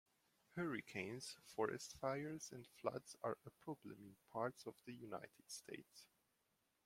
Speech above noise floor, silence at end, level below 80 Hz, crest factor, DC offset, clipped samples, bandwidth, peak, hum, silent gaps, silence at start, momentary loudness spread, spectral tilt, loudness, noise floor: 36 dB; 0.8 s; -82 dBFS; 24 dB; under 0.1%; under 0.1%; 16.5 kHz; -26 dBFS; none; none; 0.55 s; 11 LU; -4.5 dB/octave; -49 LUFS; -85 dBFS